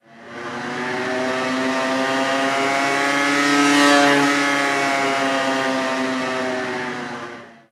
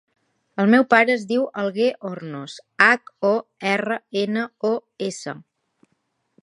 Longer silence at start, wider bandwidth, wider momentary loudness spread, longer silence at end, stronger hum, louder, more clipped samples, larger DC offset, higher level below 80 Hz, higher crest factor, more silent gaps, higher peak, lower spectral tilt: second, 0.15 s vs 0.55 s; first, 14.5 kHz vs 11 kHz; about the same, 15 LU vs 17 LU; second, 0.2 s vs 1 s; neither; about the same, -19 LUFS vs -20 LUFS; neither; neither; about the same, -74 dBFS vs -74 dBFS; about the same, 18 dB vs 22 dB; neither; about the same, -2 dBFS vs 0 dBFS; second, -3 dB/octave vs -5 dB/octave